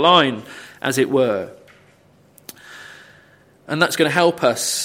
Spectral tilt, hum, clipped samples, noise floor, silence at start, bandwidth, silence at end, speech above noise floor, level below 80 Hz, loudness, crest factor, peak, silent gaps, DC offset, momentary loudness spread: -3.5 dB/octave; none; under 0.1%; -53 dBFS; 0 s; 16.5 kHz; 0 s; 36 dB; -66 dBFS; -18 LUFS; 20 dB; 0 dBFS; none; under 0.1%; 23 LU